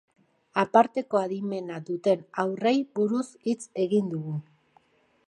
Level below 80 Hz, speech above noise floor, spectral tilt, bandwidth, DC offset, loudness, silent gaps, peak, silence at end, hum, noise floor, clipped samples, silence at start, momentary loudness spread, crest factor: -78 dBFS; 38 dB; -6.5 dB/octave; 11 kHz; under 0.1%; -27 LUFS; none; -4 dBFS; 0.85 s; none; -64 dBFS; under 0.1%; 0.55 s; 11 LU; 22 dB